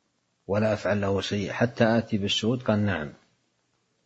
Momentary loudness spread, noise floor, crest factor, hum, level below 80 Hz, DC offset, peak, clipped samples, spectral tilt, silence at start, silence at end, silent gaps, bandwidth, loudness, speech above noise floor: 6 LU; -72 dBFS; 20 dB; none; -58 dBFS; under 0.1%; -6 dBFS; under 0.1%; -5.5 dB/octave; 0.5 s; 0.9 s; none; 8 kHz; -26 LUFS; 47 dB